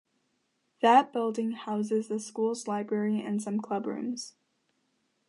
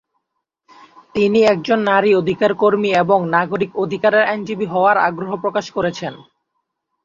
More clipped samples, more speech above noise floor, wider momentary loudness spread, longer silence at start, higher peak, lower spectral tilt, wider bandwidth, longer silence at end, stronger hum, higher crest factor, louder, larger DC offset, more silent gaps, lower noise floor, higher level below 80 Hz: neither; second, 47 dB vs 60 dB; first, 13 LU vs 8 LU; second, 0.8 s vs 1.15 s; second, -8 dBFS vs -2 dBFS; about the same, -5 dB/octave vs -6 dB/octave; first, 11.5 kHz vs 7.6 kHz; first, 1 s vs 0.85 s; neither; first, 22 dB vs 16 dB; second, -29 LUFS vs -16 LUFS; neither; neither; about the same, -76 dBFS vs -76 dBFS; second, -84 dBFS vs -58 dBFS